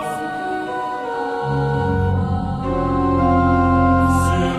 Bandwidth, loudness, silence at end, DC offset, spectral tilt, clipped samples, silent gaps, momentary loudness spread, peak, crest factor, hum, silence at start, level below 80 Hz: 13.5 kHz; -19 LUFS; 0 s; under 0.1%; -7.5 dB/octave; under 0.1%; none; 9 LU; -6 dBFS; 12 dB; none; 0 s; -32 dBFS